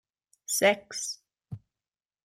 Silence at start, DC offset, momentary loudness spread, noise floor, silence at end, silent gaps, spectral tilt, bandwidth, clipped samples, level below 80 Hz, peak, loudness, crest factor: 0.5 s; under 0.1%; 22 LU; under -90 dBFS; 0.65 s; none; -2 dB/octave; 16 kHz; under 0.1%; -74 dBFS; -10 dBFS; -27 LUFS; 22 dB